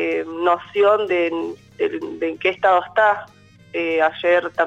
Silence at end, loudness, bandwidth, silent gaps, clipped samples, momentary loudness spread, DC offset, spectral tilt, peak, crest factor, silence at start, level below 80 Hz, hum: 0 s; -19 LUFS; 8.4 kHz; none; under 0.1%; 9 LU; under 0.1%; -5.5 dB/octave; -6 dBFS; 14 dB; 0 s; -64 dBFS; none